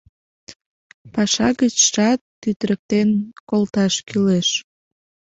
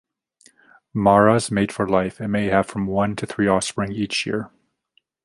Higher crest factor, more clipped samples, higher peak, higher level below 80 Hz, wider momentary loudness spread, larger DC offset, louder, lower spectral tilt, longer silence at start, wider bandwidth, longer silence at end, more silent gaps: about the same, 18 dB vs 20 dB; neither; about the same, -2 dBFS vs -2 dBFS; about the same, -54 dBFS vs -50 dBFS; about the same, 9 LU vs 10 LU; neither; about the same, -19 LUFS vs -21 LUFS; second, -3.5 dB/octave vs -5.5 dB/octave; second, 0.5 s vs 0.95 s; second, 8.2 kHz vs 11.5 kHz; about the same, 0.8 s vs 0.8 s; first, 0.56-0.60 s, 0.66-1.05 s, 2.21-2.42 s, 2.56-2.60 s, 2.79-2.89 s, 3.40-3.47 s vs none